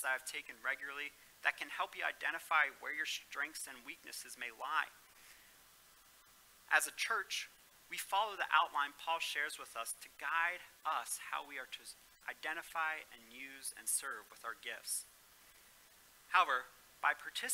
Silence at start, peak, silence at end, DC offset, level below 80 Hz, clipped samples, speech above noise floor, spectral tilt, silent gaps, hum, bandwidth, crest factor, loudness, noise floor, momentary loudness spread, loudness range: 0 s; -16 dBFS; 0 s; under 0.1%; -80 dBFS; under 0.1%; 25 dB; 1.5 dB/octave; none; none; 16 kHz; 26 dB; -39 LUFS; -65 dBFS; 15 LU; 6 LU